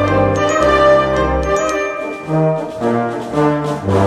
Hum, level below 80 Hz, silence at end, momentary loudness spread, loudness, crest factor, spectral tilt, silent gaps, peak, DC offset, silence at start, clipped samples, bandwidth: none; -32 dBFS; 0 s; 8 LU; -15 LUFS; 14 dB; -6 dB/octave; none; 0 dBFS; under 0.1%; 0 s; under 0.1%; 13 kHz